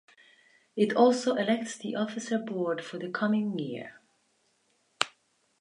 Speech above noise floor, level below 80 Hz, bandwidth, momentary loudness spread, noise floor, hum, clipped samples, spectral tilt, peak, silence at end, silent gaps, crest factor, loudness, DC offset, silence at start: 43 dB; -82 dBFS; 11 kHz; 13 LU; -71 dBFS; none; under 0.1%; -5 dB/octave; -4 dBFS; 0.5 s; none; 28 dB; -29 LUFS; under 0.1%; 0.75 s